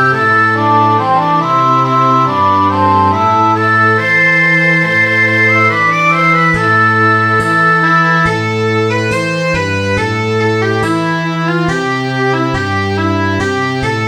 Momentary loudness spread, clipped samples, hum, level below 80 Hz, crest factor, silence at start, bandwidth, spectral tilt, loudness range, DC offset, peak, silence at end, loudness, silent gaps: 6 LU; under 0.1%; none; -40 dBFS; 12 dB; 0 s; 12.5 kHz; -6 dB/octave; 5 LU; under 0.1%; 0 dBFS; 0 s; -11 LUFS; none